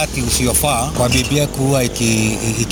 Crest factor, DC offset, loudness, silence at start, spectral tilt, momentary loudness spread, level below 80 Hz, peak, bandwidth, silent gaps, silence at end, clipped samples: 14 dB; under 0.1%; -16 LUFS; 0 s; -4 dB/octave; 3 LU; -28 dBFS; -2 dBFS; 18 kHz; none; 0 s; under 0.1%